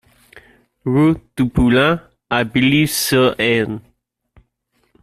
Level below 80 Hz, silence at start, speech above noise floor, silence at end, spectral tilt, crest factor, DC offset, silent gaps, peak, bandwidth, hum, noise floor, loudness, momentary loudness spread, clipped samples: -38 dBFS; 0.35 s; 50 dB; 1.2 s; -5 dB/octave; 16 dB; under 0.1%; none; -2 dBFS; 16 kHz; none; -65 dBFS; -16 LUFS; 10 LU; under 0.1%